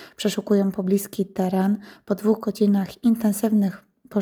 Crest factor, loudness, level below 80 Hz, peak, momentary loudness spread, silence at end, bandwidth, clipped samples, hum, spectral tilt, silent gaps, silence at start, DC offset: 14 dB; -23 LUFS; -64 dBFS; -8 dBFS; 6 LU; 0 s; over 20 kHz; under 0.1%; none; -6.5 dB/octave; none; 0 s; under 0.1%